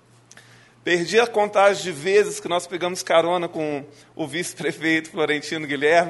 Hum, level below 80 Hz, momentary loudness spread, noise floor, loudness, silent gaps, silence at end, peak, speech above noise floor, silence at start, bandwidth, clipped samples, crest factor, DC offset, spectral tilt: none; -68 dBFS; 10 LU; -50 dBFS; -22 LUFS; none; 0 s; -4 dBFS; 29 dB; 0.85 s; 11.5 kHz; under 0.1%; 18 dB; under 0.1%; -3.5 dB/octave